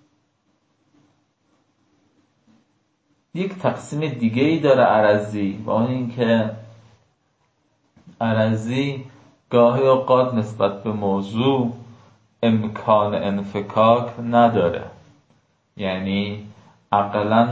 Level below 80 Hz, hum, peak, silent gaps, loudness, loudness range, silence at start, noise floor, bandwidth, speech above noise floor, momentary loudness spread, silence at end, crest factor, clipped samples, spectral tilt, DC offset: -56 dBFS; none; -4 dBFS; none; -20 LUFS; 6 LU; 3.35 s; -67 dBFS; 8 kHz; 48 dB; 12 LU; 0 s; 18 dB; under 0.1%; -7.5 dB/octave; under 0.1%